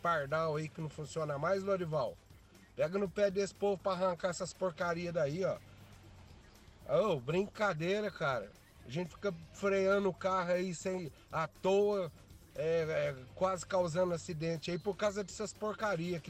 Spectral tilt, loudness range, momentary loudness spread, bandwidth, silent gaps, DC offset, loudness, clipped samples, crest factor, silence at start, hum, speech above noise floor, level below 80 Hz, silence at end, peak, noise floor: -5.5 dB/octave; 2 LU; 9 LU; 15 kHz; none; under 0.1%; -36 LUFS; under 0.1%; 14 dB; 0 s; none; 24 dB; -64 dBFS; 0 s; -22 dBFS; -59 dBFS